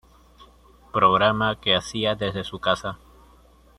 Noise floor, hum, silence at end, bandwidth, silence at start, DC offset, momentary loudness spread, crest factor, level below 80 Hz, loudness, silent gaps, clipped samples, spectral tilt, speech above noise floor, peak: -53 dBFS; none; 0.85 s; 13.5 kHz; 0.4 s; under 0.1%; 11 LU; 20 dB; -52 dBFS; -22 LUFS; none; under 0.1%; -4.5 dB/octave; 31 dB; -4 dBFS